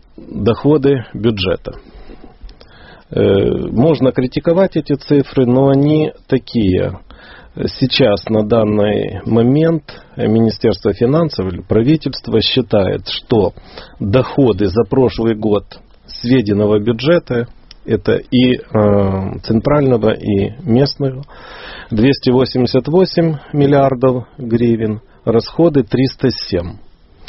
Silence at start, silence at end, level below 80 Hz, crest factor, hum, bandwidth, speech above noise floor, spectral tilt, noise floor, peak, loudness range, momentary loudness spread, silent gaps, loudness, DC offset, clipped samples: 0.2 s; 0.45 s; -38 dBFS; 14 dB; none; 6 kHz; 26 dB; -6 dB/octave; -40 dBFS; 0 dBFS; 2 LU; 9 LU; none; -14 LUFS; under 0.1%; under 0.1%